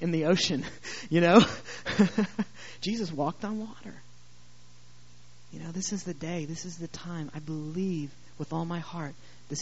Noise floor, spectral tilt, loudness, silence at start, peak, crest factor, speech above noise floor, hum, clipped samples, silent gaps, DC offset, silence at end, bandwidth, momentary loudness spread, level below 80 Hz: -57 dBFS; -5 dB/octave; -29 LUFS; 0 s; -4 dBFS; 26 dB; 28 dB; 60 Hz at -55 dBFS; under 0.1%; none; 0.5%; 0 s; 8 kHz; 16 LU; -62 dBFS